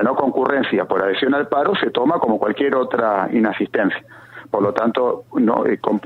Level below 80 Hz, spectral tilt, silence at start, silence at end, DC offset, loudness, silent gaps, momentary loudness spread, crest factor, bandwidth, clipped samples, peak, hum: -62 dBFS; -7.5 dB/octave; 0 s; 0.05 s; under 0.1%; -18 LUFS; none; 3 LU; 18 dB; 6.4 kHz; under 0.1%; 0 dBFS; none